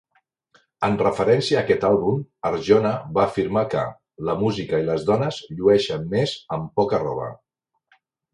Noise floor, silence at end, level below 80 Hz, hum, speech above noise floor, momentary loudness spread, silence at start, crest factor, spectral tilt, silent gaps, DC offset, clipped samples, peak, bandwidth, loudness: -65 dBFS; 1 s; -52 dBFS; none; 44 dB; 9 LU; 0.8 s; 20 dB; -6.5 dB/octave; none; under 0.1%; under 0.1%; -2 dBFS; 10.5 kHz; -22 LUFS